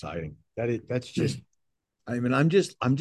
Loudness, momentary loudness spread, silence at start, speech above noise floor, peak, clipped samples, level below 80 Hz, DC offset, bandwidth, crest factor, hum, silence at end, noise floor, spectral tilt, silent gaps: -27 LUFS; 16 LU; 0.05 s; 53 dB; -10 dBFS; under 0.1%; -56 dBFS; under 0.1%; 12.5 kHz; 18 dB; none; 0 s; -80 dBFS; -6.5 dB/octave; none